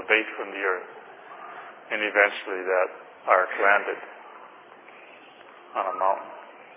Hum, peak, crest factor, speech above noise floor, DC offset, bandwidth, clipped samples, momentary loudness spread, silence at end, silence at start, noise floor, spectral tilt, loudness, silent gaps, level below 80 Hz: none; -2 dBFS; 24 dB; 24 dB; under 0.1%; 3.9 kHz; under 0.1%; 24 LU; 0 s; 0 s; -48 dBFS; -5.5 dB/octave; -25 LUFS; none; -90 dBFS